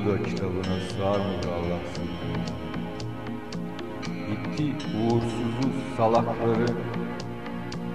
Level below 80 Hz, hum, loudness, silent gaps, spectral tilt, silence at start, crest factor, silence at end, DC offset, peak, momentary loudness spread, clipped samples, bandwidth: -50 dBFS; none; -29 LUFS; none; -7 dB/octave; 0 s; 18 dB; 0 s; 0.8%; -10 dBFS; 10 LU; under 0.1%; 13.5 kHz